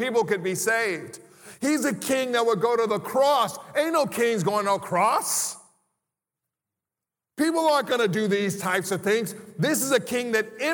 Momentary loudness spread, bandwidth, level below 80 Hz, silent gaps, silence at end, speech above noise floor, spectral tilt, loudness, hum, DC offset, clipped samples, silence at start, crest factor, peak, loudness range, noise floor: 6 LU; 19.5 kHz; -76 dBFS; none; 0 s; 65 dB; -3.5 dB/octave; -24 LUFS; none; under 0.1%; under 0.1%; 0 s; 18 dB; -8 dBFS; 4 LU; -89 dBFS